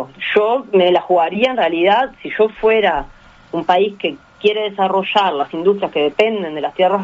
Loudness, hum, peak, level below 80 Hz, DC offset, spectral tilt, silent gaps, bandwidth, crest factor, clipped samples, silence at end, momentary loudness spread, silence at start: -16 LUFS; none; 0 dBFS; -48 dBFS; under 0.1%; -2 dB/octave; none; 7.6 kHz; 16 dB; under 0.1%; 0 s; 8 LU; 0 s